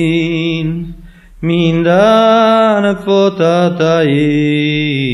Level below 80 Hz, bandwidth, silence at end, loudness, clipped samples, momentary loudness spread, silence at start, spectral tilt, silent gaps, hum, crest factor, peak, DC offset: -40 dBFS; 12 kHz; 0 s; -11 LUFS; under 0.1%; 9 LU; 0 s; -7 dB/octave; none; none; 12 dB; 0 dBFS; under 0.1%